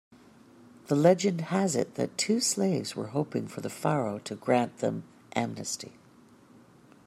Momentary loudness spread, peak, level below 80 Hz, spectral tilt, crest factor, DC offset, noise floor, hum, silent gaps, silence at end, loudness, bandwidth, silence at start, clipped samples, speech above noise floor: 12 LU; -10 dBFS; -72 dBFS; -5 dB/octave; 20 dB; under 0.1%; -57 dBFS; none; none; 1.15 s; -29 LUFS; 14 kHz; 0.9 s; under 0.1%; 29 dB